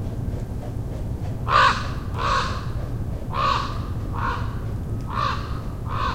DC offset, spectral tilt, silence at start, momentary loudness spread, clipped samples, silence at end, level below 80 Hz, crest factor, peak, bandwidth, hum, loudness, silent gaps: under 0.1%; -5.5 dB/octave; 0 s; 11 LU; under 0.1%; 0 s; -32 dBFS; 20 dB; -4 dBFS; 16 kHz; none; -25 LUFS; none